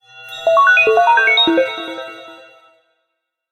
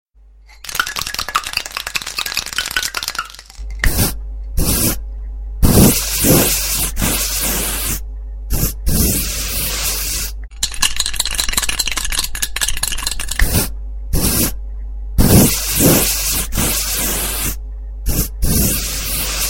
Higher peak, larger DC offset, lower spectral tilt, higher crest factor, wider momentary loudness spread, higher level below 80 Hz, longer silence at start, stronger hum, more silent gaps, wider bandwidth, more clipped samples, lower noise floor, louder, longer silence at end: about the same, -2 dBFS vs 0 dBFS; neither; about the same, -2.5 dB/octave vs -3 dB/octave; about the same, 14 dB vs 18 dB; first, 20 LU vs 14 LU; second, -64 dBFS vs -24 dBFS; second, 0.15 s vs 0.5 s; neither; neither; second, 15 kHz vs 17 kHz; neither; first, -74 dBFS vs -44 dBFS; first, -12 LUFS vs -16 LUFS; first, 1.15 s vs 0 s